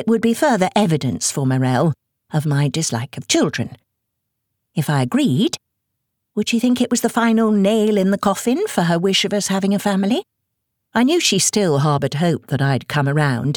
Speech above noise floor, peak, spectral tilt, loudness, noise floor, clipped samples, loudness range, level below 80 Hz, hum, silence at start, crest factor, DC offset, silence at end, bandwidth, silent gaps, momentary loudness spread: 59 dB; -4 dBFS; -5 dB/octave; -18 LUFS; -76 dBFS; under 0.1%; 4 LU; -58 dBFS; none; 0 s; 14 dB; under 0.1%; 0 s; 19.5 kHz; none; 8 LU